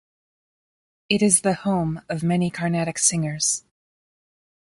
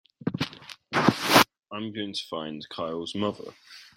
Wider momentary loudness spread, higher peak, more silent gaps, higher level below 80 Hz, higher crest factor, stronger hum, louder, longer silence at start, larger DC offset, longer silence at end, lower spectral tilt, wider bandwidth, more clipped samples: second, 8 LU vs 17 LU; about the same, -2 dBFS vs -2 dBFS; neither; first, -58 dBFS vs -64 dBFS; about the same, 22 dB vs 26 dB; neither; first, -21 LUFS vs -27 LUFS; first, 1.1 s vs 0.25 s; neither; first, 1.05 s vs 0.15 s; about the same, -4 dB/octave vs -4 dB/octave; second, 11.5 kHz vs 16.5 kHz; neither